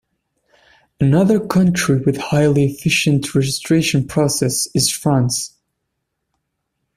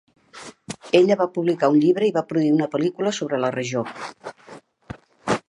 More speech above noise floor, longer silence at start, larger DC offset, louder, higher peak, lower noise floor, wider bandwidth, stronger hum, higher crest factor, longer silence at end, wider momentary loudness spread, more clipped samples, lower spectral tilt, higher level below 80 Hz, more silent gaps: first, 59 dB vs 26 dB; first, 1 s vs 0.35 s; neither; first, -16 LUFS vs -21 LUFS; about the same, -2 dBFS vs -2 dBFS; first, -75 dBFS vs -46 dBFS; first, 15 kHz vs 11 kHz; neither; about the same, 16 dB vs 20 dB; first, 1.5 s vs 0.1 s; second, 4 LU vs 23 LU; neither; about the same, -5 dB/octave vs -6 dB/octave; first, -48 dBFS vs -62 dBFS; neither